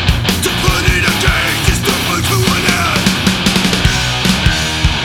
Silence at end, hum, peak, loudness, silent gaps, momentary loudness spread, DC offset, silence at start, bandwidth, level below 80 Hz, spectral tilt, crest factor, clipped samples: 0 s; none; 0 dBFS; -12 LUFS; none; 2 LU; under 0.1%; 0 s; 19.5 kHz; -22 dBFS; -3.5 dB/octave; 12 dB; under 0.1%